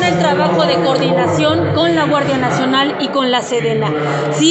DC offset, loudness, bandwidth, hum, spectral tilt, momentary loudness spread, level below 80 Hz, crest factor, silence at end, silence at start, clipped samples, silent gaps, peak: under 0.1%; -14 LUFS; 8.6 kHz; none; -5 dB/octave; 3 LU; -54 dBFS; 12 dB; 0 s; 0 s; under 0.1%; none; 0 dBFS